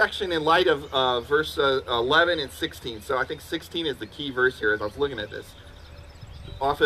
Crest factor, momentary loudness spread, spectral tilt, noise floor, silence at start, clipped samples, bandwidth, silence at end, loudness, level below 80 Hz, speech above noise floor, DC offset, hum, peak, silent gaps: 18 dB; 16 LU; -4.5 dB/octave; -44 dBFS; 0 s; under 0.1%; 15 kHz; 0 s; -24 LUFS; -48 dBFS; 19 dB; under 0.1%; none; -8 dBFS; none